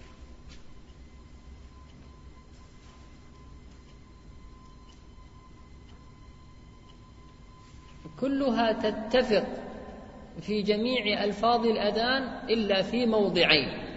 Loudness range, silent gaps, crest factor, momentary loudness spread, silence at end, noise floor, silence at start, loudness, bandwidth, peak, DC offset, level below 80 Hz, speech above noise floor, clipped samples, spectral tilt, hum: 26 LU; none; 24 dB; 22 LU; 0 s; -50 dBFS; 0 s; -26 LUFS; 8 kHz; -6 dBFS; under 0.1%; -52 dBFS; 24 dB; under 0.1%; -5.5 dB/octave; none